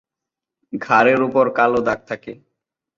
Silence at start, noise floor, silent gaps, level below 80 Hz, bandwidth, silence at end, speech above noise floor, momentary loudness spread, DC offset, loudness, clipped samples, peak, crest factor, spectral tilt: 0.75 s; -85 dBFS; none; -58 dBFS; 7.2 kHz; 0.65 s; 68 dB; 17 LU; under 0.1%; -17 LUFS; under 0.1%; -2 dBFS; 18 dB; -6.5 dB/octave